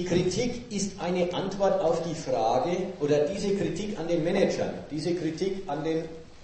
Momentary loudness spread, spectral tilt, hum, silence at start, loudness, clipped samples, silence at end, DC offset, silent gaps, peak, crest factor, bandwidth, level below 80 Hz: 6 LU; -5.5 dB/octave; none; 0 s; -28 LUFS; under 0.1%; 0 s; under 0.1%; none; -10 dBFS; 18 dB; 8.8 kHz; -50 dBFS